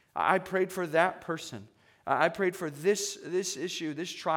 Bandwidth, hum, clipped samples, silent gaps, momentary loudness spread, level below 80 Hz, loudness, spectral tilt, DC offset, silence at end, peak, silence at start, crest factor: 18 kHz; none; under 0.1%; none; 10 LU; -74 dBFS; -30 LUFS; -3.5 dB/octave; under 0.1%; 0 s; -8 dBFS; 0.15 s; 22 dB